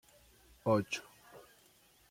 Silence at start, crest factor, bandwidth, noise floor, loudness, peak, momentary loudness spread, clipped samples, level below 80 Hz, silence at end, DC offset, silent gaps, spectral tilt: 0.65 s; 22 dB; 16.5 kHz; -66 dBFS; -35 LUFS; -18 dBFS; 24 LU; under 0.1%; -70 dBFS; 0.7 s; under 0.1%; none; -5.5 dB/octave